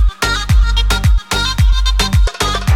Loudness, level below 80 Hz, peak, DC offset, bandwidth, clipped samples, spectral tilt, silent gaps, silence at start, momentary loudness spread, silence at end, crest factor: -14 LUFS; -14 dBFS; -2 dBFS; under 0.1%; 15 kHz; under 0.1%; -4 dB/octave; none; 0 s; 2 LU; 0 s; 10 dB